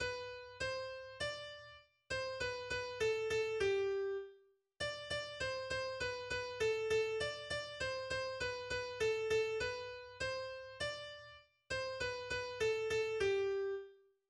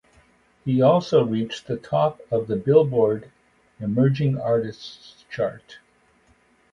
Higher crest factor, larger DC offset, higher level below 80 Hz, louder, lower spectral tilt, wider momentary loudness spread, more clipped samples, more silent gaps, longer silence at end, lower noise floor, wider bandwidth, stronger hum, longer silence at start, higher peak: second, 14 dB vs 20 dB; neither; about the same, -64 dBFS vs -60 dBFS; second, -40 LUFS vs -22 LUFS; second, -3 dB/octave vs -8 dB/octave; second, 11 LU vs 15 LU; neither; neither; second, 0.35 s vs 1 s; first, -67 dBFS vs -60 dBFS; first, 12.5 kHz vs 7.4 kHz; neither; second, 0 s vs 0.65 s; second, -26 dBFS vs -4 dBFS